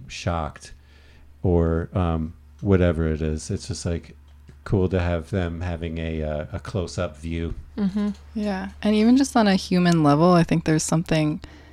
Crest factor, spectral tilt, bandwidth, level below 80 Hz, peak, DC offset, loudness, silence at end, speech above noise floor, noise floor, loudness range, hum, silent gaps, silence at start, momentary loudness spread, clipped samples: 18 dB; -6.5 dB/octave; 13 kHz; -38 dBFS; -6 dBFS; under 0.1%; -23 LUFS; 0.1 s; 27 dB; -49 dBFS; 8 LU; none; none; 0 s; 12 LU; under 0.1%